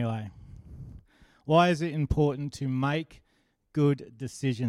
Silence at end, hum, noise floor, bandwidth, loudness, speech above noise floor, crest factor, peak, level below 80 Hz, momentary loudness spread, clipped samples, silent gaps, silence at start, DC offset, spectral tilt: 0 s; none; -71 dBFS; 12 kHz; -28 LUFS; 44 dB; 20 dB; -10 dBFS; -48 dBFS; 23 LU; under 0.1%; none; 0 s; under 0.1%; -7 dB/octave